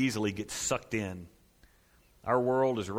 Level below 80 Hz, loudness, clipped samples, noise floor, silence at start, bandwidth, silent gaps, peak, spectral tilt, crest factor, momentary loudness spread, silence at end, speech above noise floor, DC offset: -60 dBFS; -31 LUFS; under 0.1%; -64 dBFS; 0 s; 16.5 kHz; none; -14 dBFS; -4.5 dB/octave; 20 dB; 13 LU; 0 s; 33 dB; under 0.1%